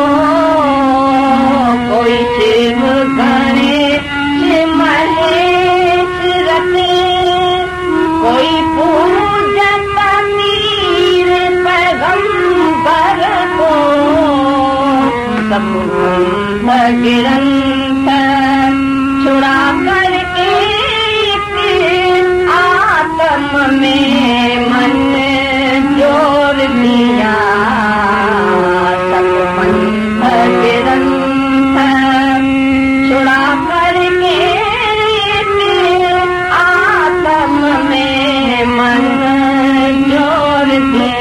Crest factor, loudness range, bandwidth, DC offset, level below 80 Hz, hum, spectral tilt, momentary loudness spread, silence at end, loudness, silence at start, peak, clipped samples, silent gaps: 8 dB; 1 LU; 12.5 kHz; under 0.1%; -36 dBFS; none; -5 dB/octave; 2 LU; 0 s; -10 LUFS; 0 s; -2 dBFS; under 0.1%; none